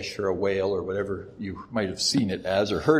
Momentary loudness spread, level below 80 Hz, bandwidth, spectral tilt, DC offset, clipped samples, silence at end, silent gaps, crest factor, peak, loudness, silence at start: 10 LU; -54 dBFS; 14.5 kHz; -4.5 dB/octave; under 0.1%; under 0.1%; 0 s; none; 18 dB; -6 dBFS; -27 LUFS; 0 s